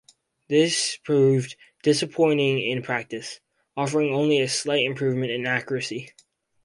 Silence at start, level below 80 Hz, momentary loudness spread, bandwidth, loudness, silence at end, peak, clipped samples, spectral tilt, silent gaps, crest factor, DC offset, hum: 0.5 s; -66 dBFS; 14 LU; 11.5 kHz; -23 LUFS; 0.55 s; -8 dBFS; under 0.1%; -4.5 dB/octave; none; 16 dB; under 0.1%; none